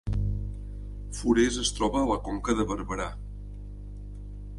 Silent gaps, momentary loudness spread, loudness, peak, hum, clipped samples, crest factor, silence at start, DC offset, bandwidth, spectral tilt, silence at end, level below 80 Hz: none; 19 LU; -28 LUFS; -10 dBFS; 50 Hz at -35 dBFS; under 0.1%; 20 dB; 0.05 s; under 0.1%; 11.5 kHz; -5 dB/octave; 0 s; -36 dBFS